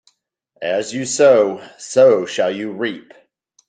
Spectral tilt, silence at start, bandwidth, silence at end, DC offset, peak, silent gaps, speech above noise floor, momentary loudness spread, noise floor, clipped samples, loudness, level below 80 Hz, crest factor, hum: -3.5 dB/octave; 0.6 s; 9.4 kHz; 0.7 s; under 0.1%; -2 dBFS; none; 48 dB; 14 LU; -64 dBFS; under 0.1%; -16 LUFS; -68 dBFS; 16 dB; none